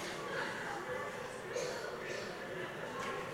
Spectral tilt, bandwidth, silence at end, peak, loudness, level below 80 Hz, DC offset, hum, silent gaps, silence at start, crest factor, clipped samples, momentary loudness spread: -3.5 dB/octave; 16 kHz; 0 s; -26 dBFS; -41 LUFS; -68 dBFS; under 0.1%; none; none; 0 s; 16 dB; under 0.1%; 3 LU